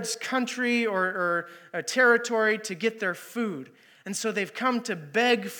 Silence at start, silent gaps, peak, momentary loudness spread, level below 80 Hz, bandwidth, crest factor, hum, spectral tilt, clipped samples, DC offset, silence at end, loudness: 0 s; none; -8 dBFS; 11 LU; under -90 dBFS; 19 kHz; 18 dB; none; -3 dB/octave; under 0.1%; under 0.1%; 0 s; -26 LUFS